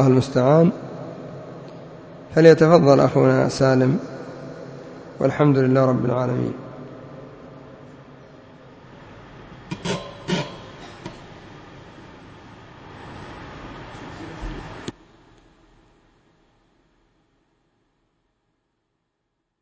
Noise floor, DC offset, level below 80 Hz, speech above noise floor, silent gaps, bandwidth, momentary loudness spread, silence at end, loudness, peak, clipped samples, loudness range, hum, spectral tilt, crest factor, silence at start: -76 dBFS; under 0.1%; -50 dBFS; 60 dB; none; 8 kHz; 27 LU; 4.7 s; -18 LUFS; 0 dBFS; under 0.1%; 23 LU; none; -7.5 dB/octave; 22 dB; 0 s